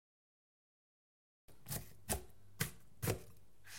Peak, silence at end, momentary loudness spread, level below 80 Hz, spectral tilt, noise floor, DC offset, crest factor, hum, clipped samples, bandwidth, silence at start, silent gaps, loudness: -20 dBFS; 0 s; 21 LU; -60 dBFS; -3.5 dB/octave; -62 dBFS; 0.2%; 28 dB; none; under 0.1%; 17 kHz; 1.45 s; none; -44 LUFS